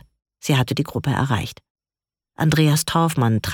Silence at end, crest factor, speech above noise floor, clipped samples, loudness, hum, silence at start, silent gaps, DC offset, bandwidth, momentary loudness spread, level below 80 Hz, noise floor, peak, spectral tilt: 0 s; 16 dB; over 71 dB; under 0.1%; -20 LUFS; none; 0.45 s; 1.70-1.75 s; under 0.1%; 18.5 kHz; 7 LU; -48 dBFS; under -90 dBFS; -4 dBFS; -5.5 dB/octave